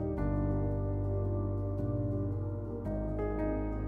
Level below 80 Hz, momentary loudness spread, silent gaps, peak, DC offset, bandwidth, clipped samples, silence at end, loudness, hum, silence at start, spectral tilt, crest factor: -40 dBFS; 4 LU; none; -22 dBFS; under 0.1%; 2.7 kHz; under 0.1%; 0 s; -35 LUFS; 50 Hz at -50 dBFS; 0 s; -12 dB/octave; 12 dB